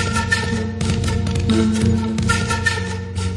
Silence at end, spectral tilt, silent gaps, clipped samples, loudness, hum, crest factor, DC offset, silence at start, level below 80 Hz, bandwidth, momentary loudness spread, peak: 0 s; -5 dB/octave; none; under 0.1%; -19 LUFS; none; 16 dB; under 0.1%; 0 s; -34 dBFS; 11.5 kHz; 5 LU; -4 dBFS